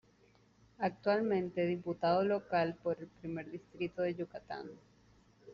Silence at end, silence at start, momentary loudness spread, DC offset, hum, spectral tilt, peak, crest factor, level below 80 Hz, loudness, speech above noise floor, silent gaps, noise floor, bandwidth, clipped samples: 0 s; 0.8 s; 13 LU; under 0.1%; none; -5.5 dB/octave; -20 dBFS; 18 dB; -72 dBFS; -36 LUFS; 32 dB; none; -67 dBFS; 7 kHz; under 0.1%